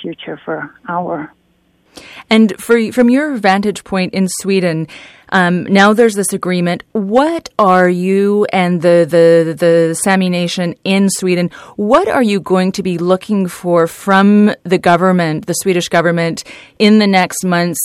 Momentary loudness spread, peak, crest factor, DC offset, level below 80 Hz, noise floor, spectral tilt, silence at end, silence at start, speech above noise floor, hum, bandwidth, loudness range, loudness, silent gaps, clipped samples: 11 LU; 0 dBFS; 12 dB; under 0.1%; -54 dBFS; -56 dBFS; -5.5 dB/octave; 0 s; 0 s; 44 dB; none; 15.5 kHz; 3 LU; -13 LUFS; none; under 0.1%